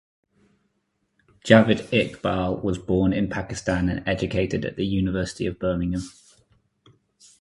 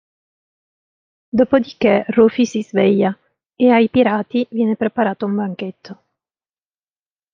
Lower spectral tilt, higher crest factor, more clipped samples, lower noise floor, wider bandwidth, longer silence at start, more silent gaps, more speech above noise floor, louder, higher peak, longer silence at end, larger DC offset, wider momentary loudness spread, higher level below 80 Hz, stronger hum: about the same, -6.5 dB/octave vs -7 dB/octave; first, 24 dB vs 16 dB; neither; second, -73 dBFS vs under -90 dBFS; first, 11.5 kHz vs 7.4 kHz; about the same, 1.45 s vs 1.35 s; neither; second, 50 dB vs over 74 dB; second, -23 LUFS vs -16 LUFS; about the same, 0 dBFS vs -2 dBFS; about the same, 1.3 s vs 1.4 s; neither; about the same, 11 LU vs 9 LU; first, -42 dBFS vs -60 dBFS; neither